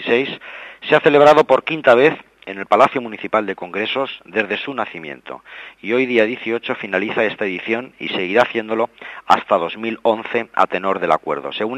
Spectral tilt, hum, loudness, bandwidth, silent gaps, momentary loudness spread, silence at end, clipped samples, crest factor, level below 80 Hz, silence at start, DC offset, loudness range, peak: -5.5 dB/octave; none; -17 LUFS; 9.8 kHz; none; 18 LU; 0 s; under 0.1%; 18 dB; -64 dBFS; 0 s; under 0.1%; 6 LU; 0 dBFS